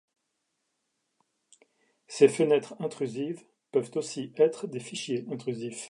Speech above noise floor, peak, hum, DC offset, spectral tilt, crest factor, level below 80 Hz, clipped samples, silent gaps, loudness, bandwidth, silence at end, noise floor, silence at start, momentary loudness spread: 52 dB; -6 dBFS; none; under 0.1%; -5 dB/octave; 24 dB; -82 dBFS; under 0.1%; none; -29 LUFS; 11.5 kHz; 0 s; -80 dBFS; 2.1 s; 13 LU